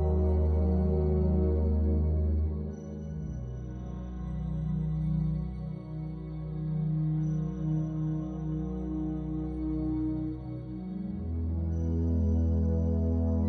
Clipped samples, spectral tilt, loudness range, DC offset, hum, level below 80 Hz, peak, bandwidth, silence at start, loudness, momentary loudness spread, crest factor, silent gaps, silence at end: under 0.1%; -11.5 dB/octave; 5 LU; under 0.1%; none; -34 dBFS; -16 dBFS; 2.4 kHz; 0 s; -31 LUFS; 11 LU; 14 dB; none; 0 s